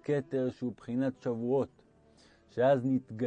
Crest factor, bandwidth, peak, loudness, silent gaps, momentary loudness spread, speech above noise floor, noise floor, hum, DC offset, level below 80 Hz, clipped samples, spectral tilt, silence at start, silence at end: 16 dB; 8.6 kHz; -16 dBFS; -32 LUFS; none; 11 LU; 31 dB; -62 dBFS; none; under 0.1%; -72 dBFS; under 0.1%; -8.5 dB/octave; 0.05 s; 0 s